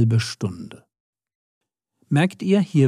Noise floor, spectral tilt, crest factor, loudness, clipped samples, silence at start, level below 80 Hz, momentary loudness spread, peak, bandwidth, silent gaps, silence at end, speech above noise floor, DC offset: -66 dBFS; -7 dB/octave; 16 dB; -22 LUFS; under 0.1%; 0 s; -66 dBFS; 16 LU; -6 dBFS; 12.5 kHz; 1.00-1.13 s, 1.35-1.61 s; 0 s; 46 dB; under 0.1%